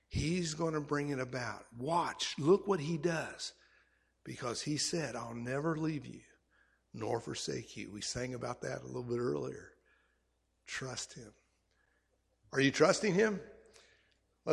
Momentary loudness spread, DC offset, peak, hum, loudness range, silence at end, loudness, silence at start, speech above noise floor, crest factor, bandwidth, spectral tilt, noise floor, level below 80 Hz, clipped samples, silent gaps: 15 LU; under 0.1%; -12 dBFS; none; 7 LU; 0 s; -36 LUFS; 0.1 s; 43 dB; 24 dB; 13.5 kHz; -4.5 dB/octave; -78 dBFS; -62 dBFS; under 0.1%; none